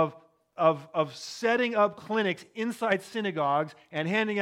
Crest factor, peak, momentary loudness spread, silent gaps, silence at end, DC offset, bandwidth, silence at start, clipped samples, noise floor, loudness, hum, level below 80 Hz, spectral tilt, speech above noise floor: 18 dB; -10 dBFS; 8 LU; none; 0 s; under 0.1%; 15.5 kHz; 0 s; under 0.1%; -48 dBFS; -28 LUFS; none; -80 dBFS; -5.5 dB/octave; 20 dB